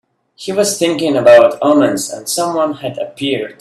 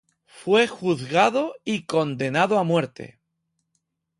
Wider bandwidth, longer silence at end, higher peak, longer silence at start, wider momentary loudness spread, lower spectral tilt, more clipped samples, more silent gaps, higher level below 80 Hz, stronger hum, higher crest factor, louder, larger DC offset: first, 13.5 kHz vs 11.5 kHz; second, 0.1 s vs 1.15 s; first, 0 dBFS vs -6 dBFS; about the same, 0.4 s vs 0.35 s; about the same, 13 LU vs 14 LU; second, -4 dB/octave vs -5.5 dB/octave; neither; neither; first, -58 dBFS vs -66 dBFS; neither; about the same, 14 dB vs 18 dB; first, -13 LUFS vs -22 LUFS; neither